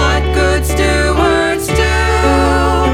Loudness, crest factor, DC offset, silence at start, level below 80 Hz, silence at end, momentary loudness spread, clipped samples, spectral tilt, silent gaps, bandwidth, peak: -12 LUFS; 12 dB; under 0.1%; 0 s; -18 dBFS; 0 s; 2 LU; under 0.1%; -5 dB/octave; none; 15.5 kHz; 0 dBFS